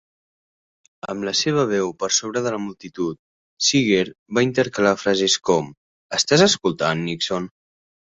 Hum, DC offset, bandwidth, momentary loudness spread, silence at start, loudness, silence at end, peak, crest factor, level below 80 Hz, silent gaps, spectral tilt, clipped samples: none; under 0.1%; 8.2 kHz; 12 LU; 1.05 s; -20 LUFS; 0.6 s; -2 dBFS; 20 dB; -58 dBFS; 3.19-3.57 s, 4.19-4.26 s, 5.77-6.09 s; -3.5 dB/octave; under 0.1%